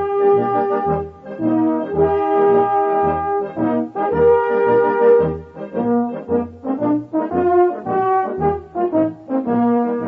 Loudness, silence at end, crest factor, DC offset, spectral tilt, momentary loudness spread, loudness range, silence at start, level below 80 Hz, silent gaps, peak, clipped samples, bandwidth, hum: -17 LUFS; 0 s; 14 dB; under 0.1%; -10.5 dB/octave; 8 LU; 3 LU; 0 s; -46 dBFS; none; -4 dBFS; under 0.1%; 4 kHz; none